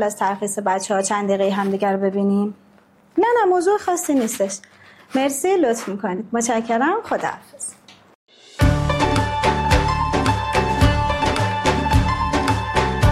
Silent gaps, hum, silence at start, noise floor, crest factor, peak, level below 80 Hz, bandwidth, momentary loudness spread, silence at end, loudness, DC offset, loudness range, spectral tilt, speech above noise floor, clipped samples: 8.15-8.27 s; none; 0 s; -53 dBFS; 16 dB; -4 dBFS; -32 dBFS; 15 kHz; 8 LU; 0 s; -20 LUFS; under 0.1%; 3 LU; -5 dB/octave; 33 dB; under 0.1%